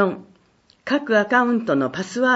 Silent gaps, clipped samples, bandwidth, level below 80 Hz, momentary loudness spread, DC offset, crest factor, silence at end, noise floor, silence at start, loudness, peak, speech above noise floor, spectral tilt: none; under 0.1%; 8 kHz; -66 dBFS; 12 LU; under 0.1%; 16 dB; 0 s; -58 dBFS; 0 s; -20 LUFS; -4 dBFS; 39 dB; -5.5 dB/octave